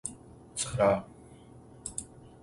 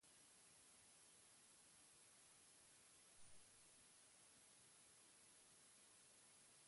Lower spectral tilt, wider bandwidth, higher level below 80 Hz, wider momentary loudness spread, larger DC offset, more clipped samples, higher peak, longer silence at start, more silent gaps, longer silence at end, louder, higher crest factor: first, -4 dB/octave vs -0.5 dB/octave; about the same, 11.5 kHz vs 11.5 kHz; first, -56 dBFS vs under -90 dBFS; first, 26 LU vs 0 LU; neither; neither; first, -12 dBFS vs -54 dBFS; about the same, 0.05 s vs 0 s; neither; first, 0.15 s vs 0 s; first, -31 LUFS vs -68 LUFS; first, 22 dB vs 16 dB